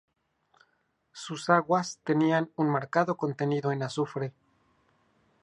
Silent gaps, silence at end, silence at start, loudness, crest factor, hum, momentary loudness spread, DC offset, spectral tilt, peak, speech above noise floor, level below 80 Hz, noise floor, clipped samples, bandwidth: none; 1.1 s; 1.15 s; -28 LUFS; 22 dB; none; 11 LU; under 0.1%; -6 dB/octave; -8 dBFS; 46 dB; -76 dBFS; -74 dBFS; under 0.1%; 11 kHz